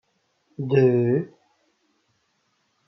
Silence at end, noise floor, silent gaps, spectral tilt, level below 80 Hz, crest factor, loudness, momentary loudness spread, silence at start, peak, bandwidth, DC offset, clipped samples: 1.6 s; -70 dBFS; none; -10.5 dB/octave; -74 dBFS; 18 dB; -21 LUFS; 20 LU; 0.6 s; -8 dBFS; 6 kHz; under 0.1%; under 0.1%